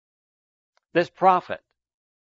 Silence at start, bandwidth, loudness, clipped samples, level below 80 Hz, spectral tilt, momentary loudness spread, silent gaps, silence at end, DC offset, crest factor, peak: 0.95 s; 7.6 kHz; -22 LUFS; under 0.1%; -74 dBFS; -6.5 dB/octave; 16 LU; none; 0.75 s; under 0.1%; 22 dB; -4 dBFS